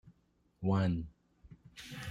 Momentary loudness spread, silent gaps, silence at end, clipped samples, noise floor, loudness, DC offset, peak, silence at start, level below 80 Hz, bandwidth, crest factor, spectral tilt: 19 LU; none; 0 s; under 0.1%; -73 dBFS; -35 LUFS; under 0.1%; -22 dBFS; 0.05 s; -58 dBFS; 14 kHz; 16 dB; -7.5 dB/octave